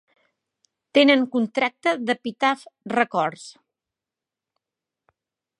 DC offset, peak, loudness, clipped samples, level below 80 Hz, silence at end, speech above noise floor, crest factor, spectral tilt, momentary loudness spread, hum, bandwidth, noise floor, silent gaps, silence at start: under 0.1%; -4 dBFS; -22 LUFS; under 0.1%; -78 dBFS; 2.1 s; 67 dB; 22 dB; -4.5 dB/octave; 12 LU; none; 11.5 kHz; -88 dBFS; none; 0.95 s